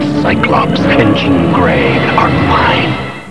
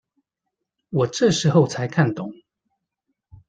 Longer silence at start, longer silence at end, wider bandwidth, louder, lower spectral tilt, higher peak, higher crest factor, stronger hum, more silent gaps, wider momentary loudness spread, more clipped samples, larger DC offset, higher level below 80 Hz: second, 0 s vs 0.9 s; second, 0 s vs 1.15 s; first, 11 kHz vs 9.4 kHz; first, -10 LUFS vs -20 LUFS; first, -7 dB/octave vs -5.5 dB/octave; first, 0 dBFS vs -4 dBFS; second, 10 dB vs 20 dB; neither; neither; second, 3 LU vs 12 LU; first, 0.1% vs under 0.1%; first, 2% vs under 0.1%; first, -30 dBFS vs -58 dBFS